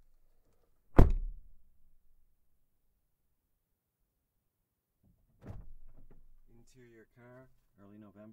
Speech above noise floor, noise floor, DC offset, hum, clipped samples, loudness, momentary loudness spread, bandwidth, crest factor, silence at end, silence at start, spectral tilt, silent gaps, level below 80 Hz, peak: 27 dB; -84 dBFS; under 0.1%; none; under 0.1%; -30 LUFS; 29 LU; 4.3 kHz; 30 dB; 2.6 s; 0.95 s; -9 dB/octave; none; -38 dBFS; -4 dBFS